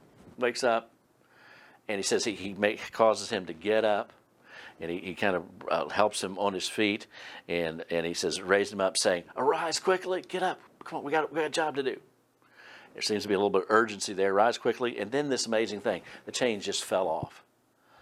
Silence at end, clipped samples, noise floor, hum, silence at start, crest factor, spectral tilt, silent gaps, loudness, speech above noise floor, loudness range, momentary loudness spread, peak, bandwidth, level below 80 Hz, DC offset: 0.6 s; under 0.1%; -66 dBFS; none; 0.25 s; 24 dB; -3 dB/octave; none; -29 LUFS; 37 dB; 3 LU; 11 LU; -6 dBFS; 15.5 kHz; -70 dBFS; under 0.1%